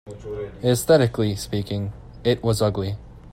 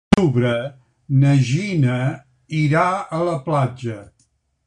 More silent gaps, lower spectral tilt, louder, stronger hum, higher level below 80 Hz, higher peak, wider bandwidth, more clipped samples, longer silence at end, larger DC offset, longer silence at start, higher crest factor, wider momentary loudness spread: neither; second, -6 dB/octave vs -7.5 dB/octave; second, -23 LUFS vs -19 LUFS; neither; about the same, -44 dBFS vs -46 dBFS; about the same, -4 dBFS vs -2 dBFS; first, 16 kHz vs 10 kHz; neither; second, 0 s vs 0.6 s; neither; about the same, 0.05 s vs 0.1 s; about the same, 20 dB vs 18 dB; about the same, 15 LU vs 14 LU